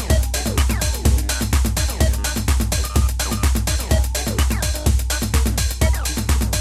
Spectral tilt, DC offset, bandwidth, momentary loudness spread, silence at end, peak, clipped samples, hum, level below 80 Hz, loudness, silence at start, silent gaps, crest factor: -4 dB/octave; 0.2%; 16 kHz; 2 LU; 0 s; -4 dBFS; under 0.1%; none; -20 dBFS; -20 LUFS; 0 s; none; 16 dB